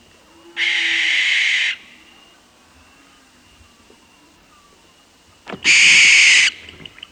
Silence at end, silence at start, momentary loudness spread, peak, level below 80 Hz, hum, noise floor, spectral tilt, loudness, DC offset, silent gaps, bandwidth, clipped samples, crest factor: 0.3 s; 0.55 s; 23 LU; 0 dBFS; -60 dBFS; none; -52 dBFS; 2 dB/octave; -12 LUFS; under 0.1%; none; 11 kHz; under 0.1%; 18 dB